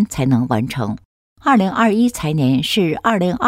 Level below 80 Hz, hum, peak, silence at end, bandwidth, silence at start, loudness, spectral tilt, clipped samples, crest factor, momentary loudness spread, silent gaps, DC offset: -46 dBFS; none; -4 dBFS; 0 s; 16 kHz; 0 s; -17 LUFS; -6 dB/octave; under 0.1%; 14 dB; 8 LU; 1.05-1.36 s; under 0.1%